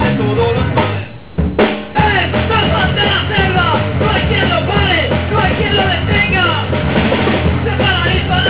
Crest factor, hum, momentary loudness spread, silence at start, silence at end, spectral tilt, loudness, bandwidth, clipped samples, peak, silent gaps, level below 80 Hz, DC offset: 14 dB; none; 3 LU; 0 s; 0 s; -9.5 dB/octave; -13 LUFS; 4 kHz; under 0.1%; 0 dBFS; none; -24 dBFS; 1%